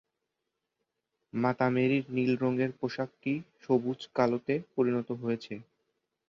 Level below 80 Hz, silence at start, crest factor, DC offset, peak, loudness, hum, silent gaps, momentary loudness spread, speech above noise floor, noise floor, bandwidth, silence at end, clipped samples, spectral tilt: -72 dBFS; 1.35 s; 20 dB; under 0.1%; -12 dBFS; -31 LUFS; none; none; 8 LU; 55 dB; -85 dBFS; 7 kHz; 0.7 s; under 0.1%; -8 dB/octave